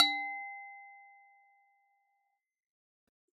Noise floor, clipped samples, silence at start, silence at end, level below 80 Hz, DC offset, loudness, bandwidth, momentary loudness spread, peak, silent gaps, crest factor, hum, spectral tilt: -81 dBFS; under 0.1%; 0 s; 2.3 s; under -90 dBFS; under 0.1%; -35 LUFS; 9 kHz; 23 LU; -10 dBFS; none; 28 dB; none; 1.5 dB/octave